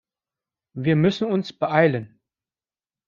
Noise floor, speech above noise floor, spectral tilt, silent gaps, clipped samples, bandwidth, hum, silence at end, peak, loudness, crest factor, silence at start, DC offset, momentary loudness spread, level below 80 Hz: under -90 dBFS; over 69 dB; -7.5 dB/octave; none; under 0.1%; 7.2 kHz; none; 1 s; -2 dBFS; -22 LUFS; 22 dB; 0.75 s; under 0.1%; 10 LU; -62 dBFS